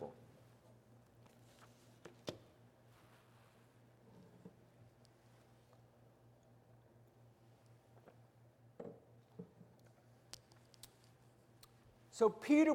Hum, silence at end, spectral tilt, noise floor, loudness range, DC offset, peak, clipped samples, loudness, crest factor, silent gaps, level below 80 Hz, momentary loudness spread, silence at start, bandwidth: none; 0 s; -5.5 dB/octave; -67 dBFS; 11 LU; under 0.1%; -20 dBFS; under 0.1%; -41 LUFS; 26 dB; none; -82 dBFS; 16 LU; 0 s; 16 kHz